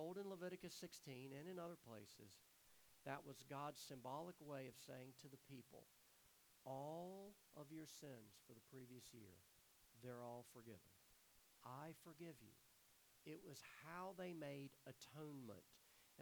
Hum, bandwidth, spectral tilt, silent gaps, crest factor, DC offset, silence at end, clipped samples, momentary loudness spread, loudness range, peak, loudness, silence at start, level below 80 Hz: none; over 20 kHz; -5 dB/octave; none; 24 dB; under 0.1%; 0 s; under 0.1%; 12 LU; 5 LU; -34 dBFS; -58 LUFS; 0 s; under -90 dBFS